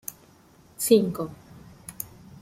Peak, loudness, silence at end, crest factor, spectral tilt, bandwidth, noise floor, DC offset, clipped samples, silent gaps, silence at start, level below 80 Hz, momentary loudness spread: -4 dBFS; -25 LUFS; 0.35 s; 24 dB; -5 dB/octave; 16.5 kHz; -55 dBFS; under 0.1%; under 0.1%; none; 0.1 s; -60 dBFS; 21 LU